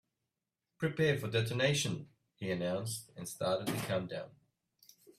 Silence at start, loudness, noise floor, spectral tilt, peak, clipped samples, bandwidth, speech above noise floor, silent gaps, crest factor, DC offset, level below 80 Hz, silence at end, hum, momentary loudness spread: 0.8 s; -35 LUFS; -89 dBFS; -4.5 dB/octave; -18 dBFS; under 0.1%; 15.5 kHz; 54 dB; none; 20 dB; under 0.1%; -70 dBFS; 0.9 s; none; 13 LU